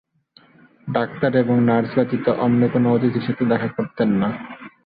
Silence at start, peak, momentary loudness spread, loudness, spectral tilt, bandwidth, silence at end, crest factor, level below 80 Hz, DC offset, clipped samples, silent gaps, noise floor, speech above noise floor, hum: 0.85 s; -4 dBFS; 8 LU; -20 LUFS; -12 dB/octave; 5 kHz; 0.2 s; 16 dB; -56 dBFS; under 0.1%; under 0.1%; none; -54 dBFS; 36 dB; none